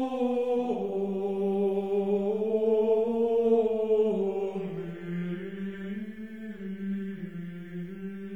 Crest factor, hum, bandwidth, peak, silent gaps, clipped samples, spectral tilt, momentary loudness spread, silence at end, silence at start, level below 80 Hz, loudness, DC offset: 14 dB; none; 7.2 kHz; -14 dBFS; none; under 0.1%; -9 dB/octave; 14 LU; 0 s; 0 s; -62 dBFS; -29 LUFS; 0.3%